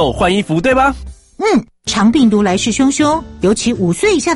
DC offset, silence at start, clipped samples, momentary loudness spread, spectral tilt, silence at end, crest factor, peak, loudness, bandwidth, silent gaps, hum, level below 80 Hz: under 0.1%; 0 s; under 0.1%; 5 LU; -4.5 dB/octave; 0 s; 12 dB; -2 dBFS; -13 LUFS; 11.5 kHz; none; none; -34 dBFS